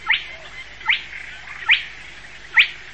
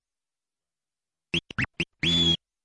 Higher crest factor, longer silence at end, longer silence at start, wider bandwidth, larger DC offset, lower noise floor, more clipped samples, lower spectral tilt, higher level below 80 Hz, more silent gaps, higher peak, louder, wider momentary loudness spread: about the same, 20 dB vs 16 dB; second, 0 s vs 0.3 s; second, 0 s vs 1.35 s; second, 8.8 kHz vs 10.5 kHz; first, 0.6% vs under 0.1%; second, -40 dBFS vs under -90 dBFS; neither; second, 0 dB/octave vs -3.5 dB/octave; about the same, -52 dBFS vs -54 dBFS; neither; first, -2 dBFS vs -14 dBFS; first, -18 LUFS vs -25 LUFS; first, 21 LU vs 9 LU